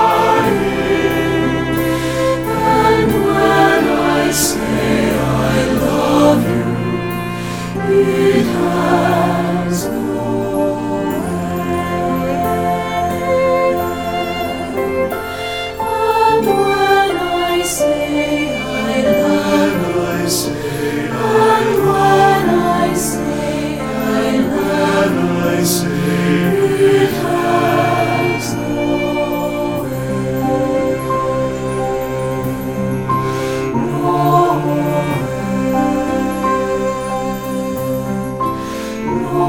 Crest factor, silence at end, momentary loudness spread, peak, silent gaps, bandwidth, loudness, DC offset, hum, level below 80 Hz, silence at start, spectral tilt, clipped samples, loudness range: 14 dB; 0 s; 8 LU; 0 dBFS; none; 18 kHz; -16 LUFS; under 0.1%; none; -38 dBFS; 0 s; -5.5 dB/octave; under 0.1%; 4 LU